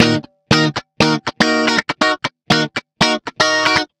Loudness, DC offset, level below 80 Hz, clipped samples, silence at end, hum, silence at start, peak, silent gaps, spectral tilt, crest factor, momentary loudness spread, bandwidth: -16 LUFS; under 0.1%; -46 dBFS; under 0.1%; 0.15 s; none; 0 s; 0 dBFS; none; -4 dB/octave; 16 dB; 4 LU; 14.5 kHz